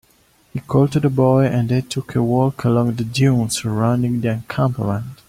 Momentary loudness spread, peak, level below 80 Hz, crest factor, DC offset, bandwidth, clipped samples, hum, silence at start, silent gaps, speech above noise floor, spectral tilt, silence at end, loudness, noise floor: 7 LU; -2 dBFS; -48 dBFS; 16 dB; under 0.1%; 15.5 kHz; under 0.1%; none; 0.55 s; none; 38 dB; -7 dB/octave; 0.15 s; -18 LUFS; -56 dBFS